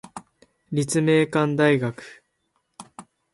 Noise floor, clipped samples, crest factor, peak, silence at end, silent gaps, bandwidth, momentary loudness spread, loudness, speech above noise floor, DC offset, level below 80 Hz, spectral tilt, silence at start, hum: -72 dBFS; under 0.1%; 18 dB; -8 dBFS; 0.3 s; none; 11.5 kHz; 23 LU; -21 LUFS; 52 dB; under 0.1%; -64 dBFS; -5.5 dB/octave; 0.05 s; none